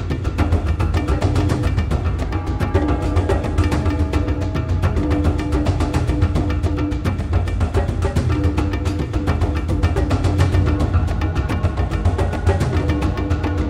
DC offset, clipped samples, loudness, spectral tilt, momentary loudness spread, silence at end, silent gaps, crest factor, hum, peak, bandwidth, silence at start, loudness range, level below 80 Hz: under 0.1%; under 0.1%; -20 LUFS; -7.5 dB/octave; 3 LU; 0 s; none; 14 dB; none; -2 dBFS; 11.5 kHz; 0 s; 1 LU; -22 dBFS